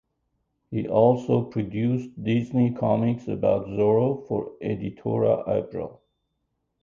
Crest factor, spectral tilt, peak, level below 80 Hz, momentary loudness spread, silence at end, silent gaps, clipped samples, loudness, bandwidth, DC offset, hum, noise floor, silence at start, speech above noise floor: 20 dB; -9.5 dB/octave; -6 dBFS; -56 dBFS; 10 LU; 0.9 s; none; under 0.1%; -24 LUFS; 7.2 kHz; under 0.1%; none; -77 dBFS; 0.7 s; 53 dB